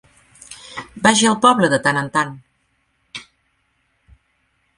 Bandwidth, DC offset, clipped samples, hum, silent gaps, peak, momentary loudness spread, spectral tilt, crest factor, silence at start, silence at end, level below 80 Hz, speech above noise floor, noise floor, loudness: 11.5 kHz; under 0.1%; under 0.1%; none; none; 0 dBFS; 22 LU; -3.5 dB/octave; 20 dB; 0.5 s; 1.55 s; -58 dBFS; 50 dB; -66 dBFS; -16 LUFS